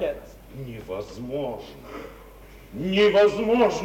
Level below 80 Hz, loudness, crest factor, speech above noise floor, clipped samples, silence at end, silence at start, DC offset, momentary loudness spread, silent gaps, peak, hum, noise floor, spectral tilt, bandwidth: -48 dBFS; -23 LUFS; 18 dB; 23 dB; under 0.1%; 0 s; 0 s; under 0.1%; 21 LU; none; -6 dBFS; none; -46 dBFS; -5.5 dB/octave; 16 kHz